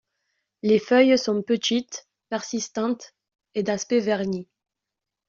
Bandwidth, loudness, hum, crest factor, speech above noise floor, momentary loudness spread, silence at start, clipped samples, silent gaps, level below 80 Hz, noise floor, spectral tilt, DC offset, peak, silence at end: 7.6 kHz; -24 LUFS; none; 20 dB; 63 dB; 15 LU; 0.65 s; under 0.1%; none; -68 dBFS; -86 dBFS; -4 dB/octave; under 0.1%; -4 dBFS; 0.85 s